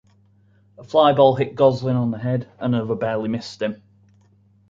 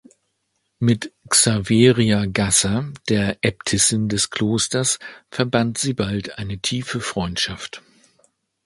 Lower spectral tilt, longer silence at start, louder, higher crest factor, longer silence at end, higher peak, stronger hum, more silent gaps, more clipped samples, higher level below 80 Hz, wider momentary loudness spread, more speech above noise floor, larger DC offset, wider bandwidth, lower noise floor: first, -7.5 dB/octave vs -4 dB/octave; about the same, 0.8 s vs 0.8 s; about the same, -20 LUFS vs -19 LUFS; about the same, 18 dB vs 20 dB; about the same, 0.95 s vs 0.85 s; about the same, -2 dBFS vs 0 dBFS; neither; neither; neither; second, -58 dBFS vs -46 dBFS; about the same, 12 LU vs 10 LU; second, 37 dB vs 52 dB; neither; second, 7.6 kHz vs 12 kHz; second, -56 dBFS vs -72 dBFS